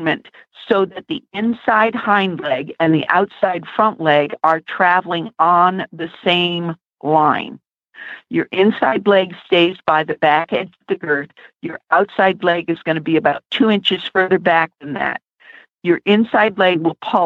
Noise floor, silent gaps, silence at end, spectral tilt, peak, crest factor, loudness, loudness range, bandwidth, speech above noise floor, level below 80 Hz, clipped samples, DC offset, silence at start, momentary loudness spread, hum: -45 dBFS; none; 0 s; -7.5 dB/octave; -2 dBFS; 16 dB; -17 LUFS; 2 LU; 7.2 kHz; 29 dB; -64 dBFS; under 0.1%; under 0.1%; 0 s; 10 LU; none